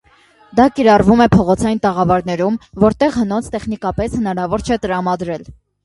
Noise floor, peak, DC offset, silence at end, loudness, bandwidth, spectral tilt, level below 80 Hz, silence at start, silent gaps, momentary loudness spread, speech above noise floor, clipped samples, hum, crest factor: -50 dBFS; 0 dBFS; under 0.1%; 0.35 s; -15 LUFS; 11.5 kHz; -7 dB/octave; -36 dBFS; 0.55 s; none; 11 LU; 35 dB; under 0.1%; none; 14 dB